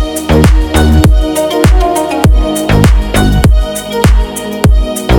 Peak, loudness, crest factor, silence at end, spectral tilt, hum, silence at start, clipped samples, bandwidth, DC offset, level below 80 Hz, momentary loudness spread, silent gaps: 0 dBFS; -10 LUFS; 8 dB; 0 s; -6 dB/octave; none; 0 s; under 0.1%; 19 kHz; under 0.1%; -10 dBFS; 4 LU; none